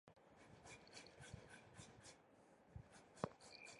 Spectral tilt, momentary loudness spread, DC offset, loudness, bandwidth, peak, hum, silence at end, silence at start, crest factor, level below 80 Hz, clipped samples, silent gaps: -4.5 dB/octave; 14 LU; under 0.1%; -59 LUFS; 11.5 kHz; -24 dBFS; none; 0 s; 0.05 s; 34 dB; -74 dBFS; under 0.1%; none